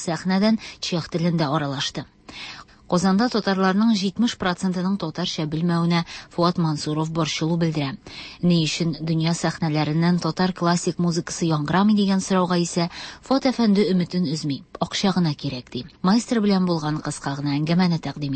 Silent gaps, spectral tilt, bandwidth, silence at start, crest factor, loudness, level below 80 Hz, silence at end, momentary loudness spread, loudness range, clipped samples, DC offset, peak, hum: none; -5.5 dB/octave; 8.8 kHz; 0 s; 14 dB; -22 LUFS; -54 dBFS; 0 s; 9 LU; 2 LU; under 0.1%; under 0.1%; -8 dBFS; none